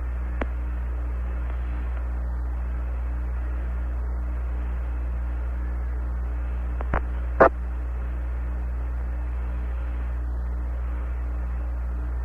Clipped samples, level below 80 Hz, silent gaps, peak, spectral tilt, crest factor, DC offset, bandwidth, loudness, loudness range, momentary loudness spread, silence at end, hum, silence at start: under 0.1%; -28 dBFS; none; -4 dBFS; -9.5 dB/octave; 22 dB; under 0.1%; 3.3 kHz; -29 LUFS; 4 LU; 3 LU; 0 s; 60 Hz at -25 dBFS; 0 s